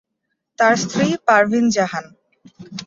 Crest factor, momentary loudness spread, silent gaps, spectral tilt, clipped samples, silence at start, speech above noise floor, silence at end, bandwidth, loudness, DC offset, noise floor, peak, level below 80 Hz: 18 dB; 11 LU; none; -4.5 dB/octave; under 0.1%; 0.6 s; 59 dB; 0 s; 7.8 kHz; -17 LUFS; under 0.1%; -76 dBFS; -2 dBFS; -60 dBFS